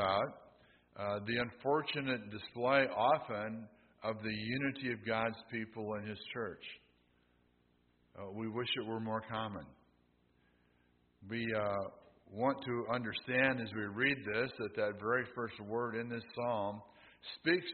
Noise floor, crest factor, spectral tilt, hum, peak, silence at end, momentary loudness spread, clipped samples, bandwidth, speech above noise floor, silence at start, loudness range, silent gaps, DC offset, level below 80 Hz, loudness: -73 dBFS; 22 dB; -3 dB/octave; 60 Hz at -70 dBFS; -16 dBFS; 0 s; 12 LU; under 0.1%; 4.5 kHz; 36 dB; 0 s; 7 LU; none; under 0.1%; -72 dBFS; -37 LUFS